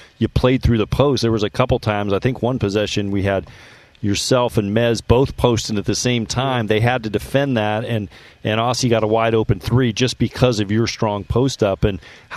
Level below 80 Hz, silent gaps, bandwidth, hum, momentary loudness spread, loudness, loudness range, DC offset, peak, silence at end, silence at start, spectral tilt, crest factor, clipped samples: -34 dBFS; none; 14 kHz; none; 5 LU; -18 LUFS; 2 LU; under 0.1%; 0 dBFS; 0 s; 0 s; -5.5 dB/octave; 18 dB; under 0.1%